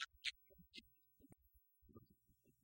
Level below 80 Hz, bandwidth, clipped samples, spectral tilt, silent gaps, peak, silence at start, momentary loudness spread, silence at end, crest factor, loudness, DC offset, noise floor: -80 dBFS; 16.5 kHz; under 0.1%; -1 dB/octave; none; -26 dBFS; 0 s; 21 LU; 0.1 s; 32 dB; -51 LUFS; under 0.1%; -78 dBFS